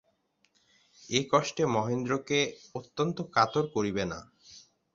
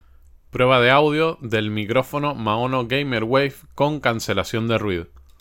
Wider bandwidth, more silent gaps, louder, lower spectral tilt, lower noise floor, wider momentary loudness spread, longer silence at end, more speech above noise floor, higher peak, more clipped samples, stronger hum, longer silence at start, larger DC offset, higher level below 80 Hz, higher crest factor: second, 7.8 kHz vs 17 kHz; neither; second, -29 LUFS vs -20 LUFS; about the same, -4.5 dB/octave vs -5.5 dB/octave; first, -72 dBFS vs -49 dBFS; about the same, 9 LU vs 9 LU; first, 0.35 s vs 0.2 s; first, 43 dB vs 29 dB; second, -8 dBFS vs -2 dBFS; neither; neither; first, 1 s vs 0.55 s; neither; second, -62 dBFS vs -48 dBFS; about the same, 22 dB vs 20 dB